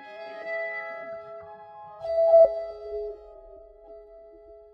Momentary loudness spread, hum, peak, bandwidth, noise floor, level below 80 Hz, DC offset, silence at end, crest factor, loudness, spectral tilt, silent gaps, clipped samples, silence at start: 27 LU; none; -8 dBFS; 4.9 kHz; -49 dBFS; -60 dBFS; under 0.1%; 0.2 s; 18 dB; -24 LUFS; -5.5 dB/octave; none; under 0.1%; 0 s